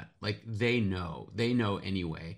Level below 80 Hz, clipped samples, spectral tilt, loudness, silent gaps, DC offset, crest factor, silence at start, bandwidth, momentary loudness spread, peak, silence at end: -58 dBFS; under 0.1%; -7 dB/octave; -32 LUFS; none; under 0.1%; 16 dB; 0 s; 10.5 kHz; 8 LU; -16 dBFS; 0 s